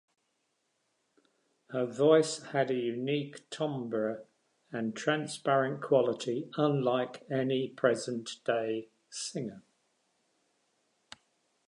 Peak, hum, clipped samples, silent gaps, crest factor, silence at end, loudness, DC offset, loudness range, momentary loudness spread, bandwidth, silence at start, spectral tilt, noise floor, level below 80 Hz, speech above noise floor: -10 dBFS; none; under 0.1%; none; 22 dB; 2.1 s; -31 LUFS; under 0.1%; 5 LU; 11 LU; 11 kHz; 1.7 s; -5 dB/octave; -79 dBFS; -84 dBFS; 48 dB